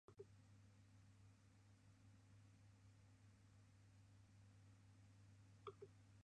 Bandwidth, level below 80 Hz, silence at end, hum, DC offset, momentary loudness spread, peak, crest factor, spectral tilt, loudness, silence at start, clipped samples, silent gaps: 9.6 kHz; -82 dBFS; 0 s; none; under 0.1%; 8 LU; -40 dBFS; 26 dB; -6 dB/octave; -65 LUFS; 0.1 s; under 0.1%; none